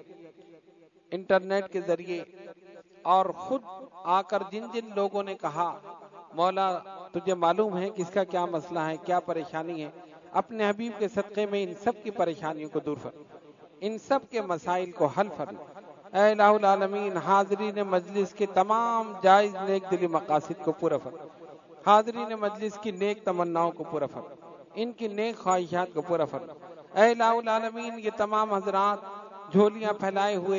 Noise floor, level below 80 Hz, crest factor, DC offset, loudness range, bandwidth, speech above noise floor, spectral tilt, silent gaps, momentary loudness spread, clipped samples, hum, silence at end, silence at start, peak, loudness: -59 dBFS; -76 dBFS; 22 dB; under 0.1%; 6 LU; 7.4 kHz; 31 dB; -5.5 dB/octave; none; 15 LU; under 0.1%; none; 0 s; 0.1 s; -6 dBFS; -28 LUFS